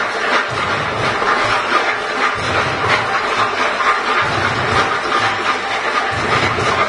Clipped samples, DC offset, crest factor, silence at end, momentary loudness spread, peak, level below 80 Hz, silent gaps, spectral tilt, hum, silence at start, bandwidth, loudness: under 0.1%; under 0.1%; 16 dB; 0 s; 3 LU; 0 dBFS; -46 dBFS; none; -3.5 dB/octave; none; 0 s; 11 kHz; -16 LUFS